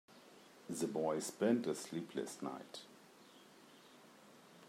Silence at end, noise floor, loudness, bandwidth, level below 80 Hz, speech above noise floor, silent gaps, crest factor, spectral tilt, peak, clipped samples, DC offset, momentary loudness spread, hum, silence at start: 0 s; -62 dBFS; -40 LUFS; 16 kHz; -90 dBFS; 23 dB; none; 22 dB; -4.5 dB/octave; -22 dBFS; under 0.1%; under 0.1%; 25 LU; none; 0.1 s